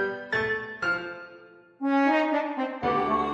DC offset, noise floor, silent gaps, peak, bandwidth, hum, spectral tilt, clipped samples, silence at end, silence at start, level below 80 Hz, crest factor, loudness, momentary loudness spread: under 0.1%; -51 dBFS; none; -12 dBFS; 7.8 kHz; none; -6 dB/octave; under 0.1%; 0 s; 0 s; -58 dBFS; 14 dB; -26 LUFS; 12 LU